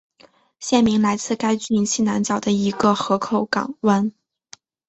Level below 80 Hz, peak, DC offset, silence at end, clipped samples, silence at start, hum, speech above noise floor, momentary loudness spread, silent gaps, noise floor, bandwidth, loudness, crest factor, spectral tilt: -56 dBFS; -2 dBFS; under 0.1%; 0.8 s; under 0.1%; 0.6 s; none; 35 dB; 4 LU; none; -54 dBFS; 8.2 kHz; -20 LUFS; 18 dB; -4.5 dB/octave